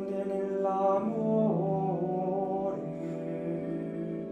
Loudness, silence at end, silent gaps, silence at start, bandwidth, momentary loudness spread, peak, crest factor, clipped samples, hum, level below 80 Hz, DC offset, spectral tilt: -31 LUFS; 0 s; none; 0 s; 8.6 kHz; 8 LU; -16 dBFS; 14 dB; under 0.1%; none; -68 dBFS; under 0.1%; -10 dB/octave